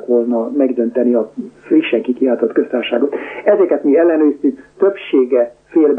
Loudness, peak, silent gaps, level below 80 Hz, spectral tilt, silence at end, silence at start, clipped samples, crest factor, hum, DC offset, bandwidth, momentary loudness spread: -15 LUFS; -2 dBFS; none; -64 dBFS; -7.5 dB/octave; 0 s; 0 s; under 0.1%; 12 dB; none; under 0.1%; 3.7 kHz; 6 LU